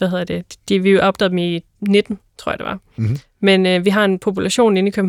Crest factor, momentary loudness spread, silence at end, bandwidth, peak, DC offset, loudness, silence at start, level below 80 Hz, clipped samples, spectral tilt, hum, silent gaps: 14 dB; 12 LU; 0 s; 13 kHz; -2 dBFS; under 0.1%; -17 LUFS; 0 s; -52 dBFS; under 0.1%; -5.5 dB/octave; none; none